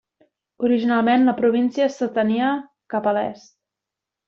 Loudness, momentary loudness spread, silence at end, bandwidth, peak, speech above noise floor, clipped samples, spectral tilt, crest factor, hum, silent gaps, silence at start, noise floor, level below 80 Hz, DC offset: -20 LUFS; 9 LU; 0.9 s; 7.2 kHz; -6 dBFS; 66 dB; under 0.1%; -6.5 dB/octave; 14 dB; none; none; 0.6 s; -86 dBFS; -68 dBFS; under 0.1%